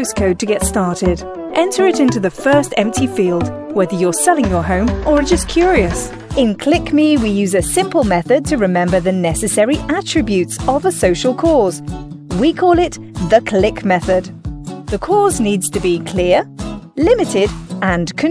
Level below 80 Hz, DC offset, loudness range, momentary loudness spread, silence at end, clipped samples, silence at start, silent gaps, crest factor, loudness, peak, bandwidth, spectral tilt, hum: -30 dBFS; under 0.1%; 2 LU; 7 LU; 0 s; under 0.1%; 0 s; none; 14 dB; -15 LUFS; 0 dBFS; 11 kHz; -5 dB/octave; none